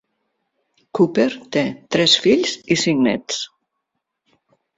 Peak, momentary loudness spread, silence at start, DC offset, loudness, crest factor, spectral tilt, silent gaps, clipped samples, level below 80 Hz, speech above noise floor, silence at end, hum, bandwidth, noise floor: -2 dBFS; 12 LU; 0.95 s; under 0.1%; -18 LUFS; 20 dB; -4 dB/octave; none; under 0.1%; -60 dBFS; 59 dB; 1.3 s; none; 8 kHz; -77 dBFS